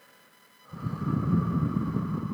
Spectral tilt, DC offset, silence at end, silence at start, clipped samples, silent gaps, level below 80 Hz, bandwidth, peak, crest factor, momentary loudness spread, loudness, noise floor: -9.5 dB/octave; under 0.1%; 0 s; 0.7 s; under 0.1%; none; -50 dBFS; 12.5 kHz; -14 dBFS; 16 dB; 11 LU; -29 LUFS; -58 dBFS